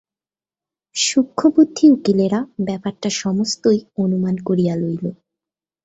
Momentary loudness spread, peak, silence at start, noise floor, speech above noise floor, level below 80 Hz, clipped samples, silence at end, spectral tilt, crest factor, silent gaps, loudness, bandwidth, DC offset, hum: 11 LU; -2 dBFS; 0.95 s; under -90 dBFS; over 73 dB; -60 dBFS; under 0.1%; 0.7 s; -5 dB/octave; 16 dB; none; -18 LUFS; 8.4 kHz; under 0.1%; none